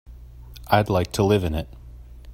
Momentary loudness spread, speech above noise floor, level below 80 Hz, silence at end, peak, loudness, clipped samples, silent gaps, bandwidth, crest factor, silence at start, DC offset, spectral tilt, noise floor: 21 LU; 21 dB; -40 dBFS; 0 s; -2 dBFS; -22 LUFS; under 0.1%; none; 16.5 kHz; 22 dB; 0.1 s; under 0.1%; -6 dB/octave; -41 dBFS